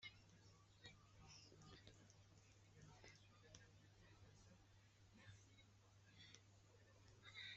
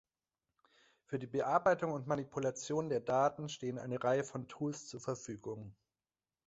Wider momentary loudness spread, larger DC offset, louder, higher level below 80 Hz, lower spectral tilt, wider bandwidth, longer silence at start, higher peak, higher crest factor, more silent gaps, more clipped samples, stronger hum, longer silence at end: second, 6 LU vs 12 LU; neither; second, -66 LUFS vs -37 LUFS; second, -80 dBFS vs -74 dBFS; second, -2.5 dB/octave vs -5.5 dB/octave; about the same, 8 kHz vs 8 kHz; second, 0 s vs 1.1 s; second, -42 dBFS vs -18 dBFS; about the same, 24 dB vs 20 dB; neither; neither; neither; second, 0 s vs 0.75 s